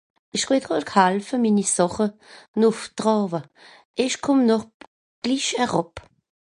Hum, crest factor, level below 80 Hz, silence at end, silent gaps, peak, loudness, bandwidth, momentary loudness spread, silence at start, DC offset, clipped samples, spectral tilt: none; 20 dB; -60 dBFS; 0.6 s; 2.48-2.54 s, 3.85-3.94 s, 4.74-4.80 s, 4.87-5.22 s; -2 dBFS; -22 LUFS; 11.5 kHz; 10 LU; 0.35 s; under 0.1%; under 0.1%; -4 dB/octave